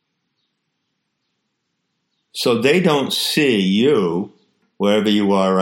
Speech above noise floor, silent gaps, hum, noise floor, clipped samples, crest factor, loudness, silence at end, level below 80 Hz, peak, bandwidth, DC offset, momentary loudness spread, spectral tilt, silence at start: 57 dB; none; none; -73 dBFS; under 0.1%; 16 dB; -17 LUFS; 0 s; -68 dBFS; -2 dBFS; 16.5 kHz; under 0.1%; 7 LU; -5 dB/octave; 2.35 s